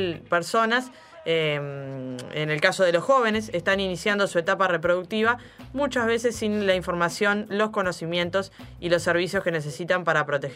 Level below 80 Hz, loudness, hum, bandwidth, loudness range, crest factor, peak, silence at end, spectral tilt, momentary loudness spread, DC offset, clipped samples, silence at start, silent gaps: -54 dBFS; -24 LUFS; none; 15.5 kHz; 2 LU; 22 dB; -4 dBFS; 0 s; -4.5 dB/octave; 10 LU; under 0.1%; under 0.1%; 0 s; none